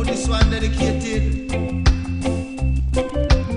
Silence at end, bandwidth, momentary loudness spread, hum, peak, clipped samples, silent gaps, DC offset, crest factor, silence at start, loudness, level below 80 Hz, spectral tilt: 0 s; 10.5 kHz; 5 LU; none; -2 dBFS; under 0.1%; none; under 0.1%; 18 dB; 0 s; -21 LUFS; -22 dBFS; -6 dB/octave